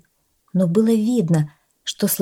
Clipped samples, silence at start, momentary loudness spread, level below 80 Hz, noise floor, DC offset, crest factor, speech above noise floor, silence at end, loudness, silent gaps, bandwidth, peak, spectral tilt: under 0.1%; 0.55 s; 12 LU; -66 dBFS; -65 dBFS; under 0.1%; 14 dB; 47 dB; 0 s; -20 LUFS; none; 17 kHz; -6 dBFS; -6 dB/octave